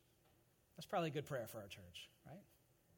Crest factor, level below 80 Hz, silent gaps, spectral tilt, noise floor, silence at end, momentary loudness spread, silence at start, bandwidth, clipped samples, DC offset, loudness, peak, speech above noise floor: 20 dB; -82 dBFS; none; -5.5 dB/octave; -75 dBFS; 0.55 s; 19 LU; 0.75 s; 17.5 kHz; under 0.1%; under 0.1%; -47 LUFS; -30 dBFS; 28 dB